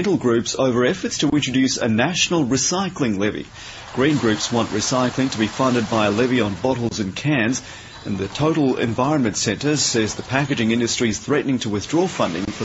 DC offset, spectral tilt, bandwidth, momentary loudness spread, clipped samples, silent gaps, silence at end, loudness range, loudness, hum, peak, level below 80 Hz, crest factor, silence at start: under 0.1%; -4 dB/octave; 8.2 kHz; 6 LU; under 0.1%; none; 0 s; 2 LU; -20 LUFS; none; -2 dBFS; -50 dBFS; 18 dB; 0 s